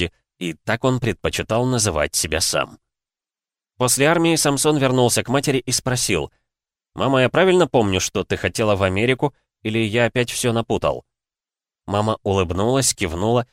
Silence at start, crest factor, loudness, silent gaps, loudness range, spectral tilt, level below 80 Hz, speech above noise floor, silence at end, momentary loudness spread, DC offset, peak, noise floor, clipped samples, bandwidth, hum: 0 s; 16 dB; -19 LUFS; none; 3 LU; -4 dB/octave; -44 dBFS; over 71 dB; 0.1 s; 9 LU; under 0.1%; -4 dBFS; under -90 dBFS; under 0.1%; 16 kHz; none